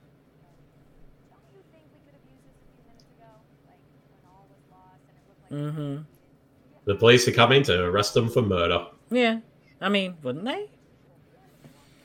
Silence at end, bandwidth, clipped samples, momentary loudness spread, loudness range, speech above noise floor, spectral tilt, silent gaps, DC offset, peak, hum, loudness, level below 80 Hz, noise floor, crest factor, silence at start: 1.4 s; 17 kHz; under 0.1%; 17 LU; 18 LU; 36 dB; -5 dB/octave; none; under 0.1%; -4 dBFS; none; -23 LUFS; -62 dBFS; -59 dBFS; 24 dB; 5.5 s